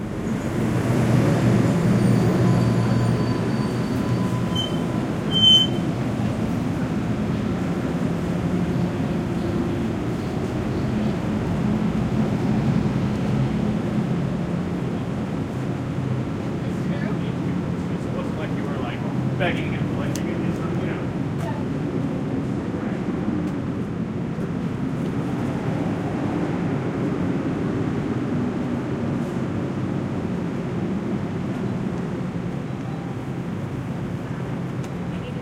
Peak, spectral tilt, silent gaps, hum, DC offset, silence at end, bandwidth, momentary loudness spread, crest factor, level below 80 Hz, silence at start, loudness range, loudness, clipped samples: -6 dBFS; -6.5 dB/octave; none; none; under 0.1%; 0 s; 15.5 kHz; 8 LU; 18 dB; -44 dBFS; 0 s; 6 LU; -24 LUFS; under 0.1%